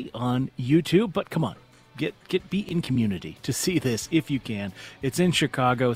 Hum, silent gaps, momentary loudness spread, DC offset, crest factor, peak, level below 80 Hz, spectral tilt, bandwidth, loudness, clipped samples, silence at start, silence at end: none; none; 10 LU; under 0.1%; 18 dB; -8 dBFS; -54 dBFS; -5.5 dB/octave; 16 kHz; -26 LUFS; under 0.1%; 0 s; 0 s